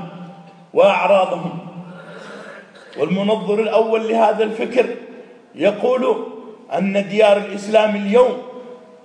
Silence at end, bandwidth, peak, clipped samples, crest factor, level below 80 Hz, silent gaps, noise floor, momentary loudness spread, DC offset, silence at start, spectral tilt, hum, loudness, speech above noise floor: 0.25 s; 10 kHz; -2 dBFS; under 0.1%; 16 dB; -70 dBFS; none; -39 dBFS; 21 LU; under 0.1%; 0 s; -6 dB/octave; none; -17 LUFS; 23 dB